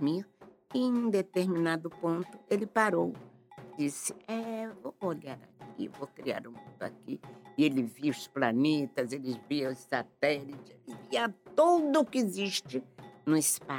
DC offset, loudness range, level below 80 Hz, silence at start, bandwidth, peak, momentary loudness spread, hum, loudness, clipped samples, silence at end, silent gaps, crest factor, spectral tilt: under 0.1%; 8 LU; -80 dBFS; 0 s; 18 kHz; -12 dBFS; 16 LU; none; -32 LUFS; under 0.1%; 0 s; none; 20 dB; -4.5 dB/octave